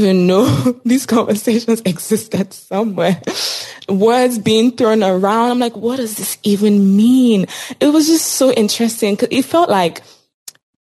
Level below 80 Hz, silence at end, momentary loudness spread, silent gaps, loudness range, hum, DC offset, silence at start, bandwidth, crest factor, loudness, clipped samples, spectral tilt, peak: -60 dBFS; 0.3 s; 8 LU; 10.34-10.46 s; 3 LU; none; under 0.1%; 0 s; 15 kHz; 12 dB; -14 LUFS; under 0.1%; -5 dB/octave; -2 dBFS